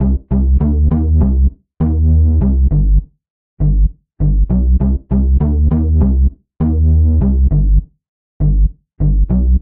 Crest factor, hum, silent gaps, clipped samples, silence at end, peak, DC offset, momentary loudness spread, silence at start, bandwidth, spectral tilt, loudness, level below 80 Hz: 10 dB; none; 3.30-3.57 s, 8.09-8.40 s; under 0.1%; 0 s; -2 dBFS; under 0.1%; 6 LU; 0 s; 1.7 kHz; -14.5 dB/octave; -14 LUFS; -14 dBFS